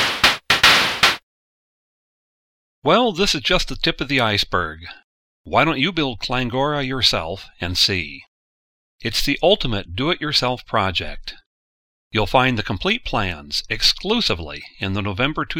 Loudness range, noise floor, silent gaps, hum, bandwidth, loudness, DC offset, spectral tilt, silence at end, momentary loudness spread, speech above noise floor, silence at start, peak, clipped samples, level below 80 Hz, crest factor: 3 LU; under -90 dBFS; 1.23-2.82 s, 5.04-5.44 s, 8.28-8.99 s, 11.46-12.11 s; none; 16.5 kHz; -19 LUFS; under 0.1%; -3.5 dB/octave; 0 s; 13 LU; over 70 dB; 0 s; 0 dBFS; under 0.1%; -36 dBFS; 20 dB